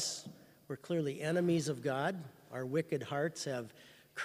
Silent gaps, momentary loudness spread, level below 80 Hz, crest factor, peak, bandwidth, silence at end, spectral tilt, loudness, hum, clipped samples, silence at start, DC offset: none; 15 LU; -78 dBFS; 16 dB; -20 dBFS; 15.5 kHz; 0 s; -5 dB/octave; -37 LUFS; none; under 0.1%; 0 s; under 0.1%